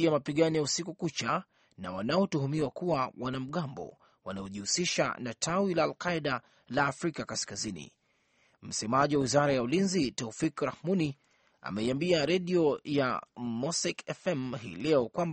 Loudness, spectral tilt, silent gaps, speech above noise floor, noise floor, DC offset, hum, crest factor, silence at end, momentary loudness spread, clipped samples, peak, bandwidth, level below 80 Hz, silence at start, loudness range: -31 LUFS; -4.5 dB/octave; none; 40 dB; -71 dBFS; under 0.1%; none; 20 dB; 0 s; 11 LU; under 0.1%; -10 dBFS; 8.8 kHz; -64 dBFS; 0 s; 3 LU